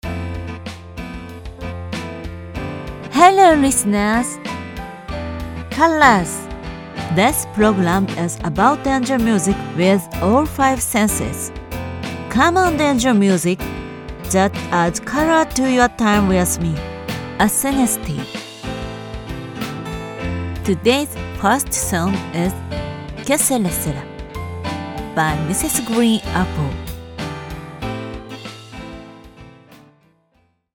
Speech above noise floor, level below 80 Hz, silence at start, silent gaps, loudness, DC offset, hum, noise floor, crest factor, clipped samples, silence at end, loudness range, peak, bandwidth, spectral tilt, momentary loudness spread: 46 dB; -36 dBFS; 0.05 s; none; -18 LUFS; under 0.1%; none; -62 dBFS; 18 dB; under 0.1%; 1 s; 7 LU; 0 dBFS; 19 kHz; -4.5 dB/octave; 16 LU